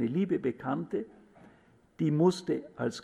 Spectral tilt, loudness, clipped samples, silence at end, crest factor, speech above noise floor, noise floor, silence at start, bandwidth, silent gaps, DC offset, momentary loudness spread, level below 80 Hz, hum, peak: -7.5 dB/octave; -31 LUFS; under 0.1%; 0 s; 18 dB; 32 dB; -62 dBFS; 0 s; 11.5 kHz; none; under 0.1%; 10 LU; -70 dBFS; none; -14 dBFS